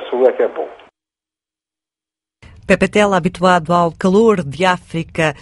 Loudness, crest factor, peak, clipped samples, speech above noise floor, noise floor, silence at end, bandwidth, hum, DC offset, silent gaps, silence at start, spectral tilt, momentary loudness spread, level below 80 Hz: -15 LUFS; 16 dB; 0 dBFS; under 0.1%; 74 dB; -89 dBFS; 0.1 s; 11.5 kHz; none; under 0.1%; none; 0 s; -6 dB/octave; 8 LU; -46 dBFS